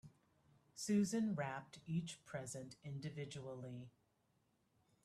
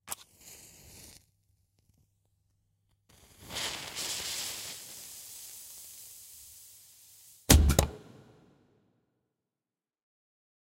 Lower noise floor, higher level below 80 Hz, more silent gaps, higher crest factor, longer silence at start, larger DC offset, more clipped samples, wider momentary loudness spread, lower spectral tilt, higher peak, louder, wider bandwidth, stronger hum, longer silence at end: second, -80 dBFS vs under -90 dBFS; second, -80 dBFS vs -40 dBFS; neither; second, 18 dB vs 32 dB; about the same, 0.05 s vs 0.05 s; neither; neither; second, 14 LU vs 28 LU; first, -5.5 dB/octave vs -3.5 dB/octave; second, -28 dBFS vs -4 dBFS; second, -44 LUFS vs -30 LUFS; second, 13 kHz vs 16 kHz; neither; second, 1.15 s vs 2.65 s